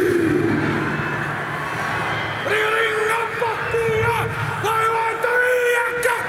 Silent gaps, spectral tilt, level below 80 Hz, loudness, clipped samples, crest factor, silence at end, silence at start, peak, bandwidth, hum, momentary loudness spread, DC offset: none; -5 dB/octave; -48 dBFS; -20 LUFS; under 0.1%; 14 dB; 0 s; 0 s; -6 dBFS; 16.5 kHz; none; 6 LU; under 0.1%